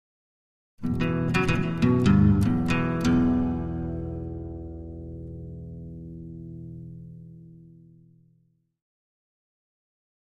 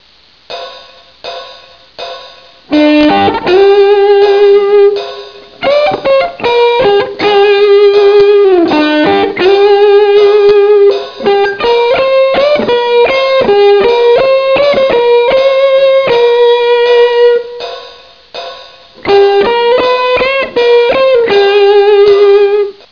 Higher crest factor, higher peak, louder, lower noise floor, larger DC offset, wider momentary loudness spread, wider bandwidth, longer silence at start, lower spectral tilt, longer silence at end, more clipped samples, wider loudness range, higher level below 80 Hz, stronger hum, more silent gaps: first, 20 dB vs 8 dB; second, -8 dBFS vs 0 dBFS; second, -24 LUFS vs -7 LUFS; first, -67 dBFS vs -44 dBFS; second, under 0.1% vs 0.3%; about the same, 20 LU vs 18 LU; first, 12.5 kHz vs 5.4 kHz; first, 0.8 s vs 0.5 s; first, -7.5 dB/octave vs -5.5 dB/octave; first, 2.7 s vs 0.2 s; neither; first, 21 LU vs 4 LU; about the same, -42 dBFS vs -44 dBFS; neither; neither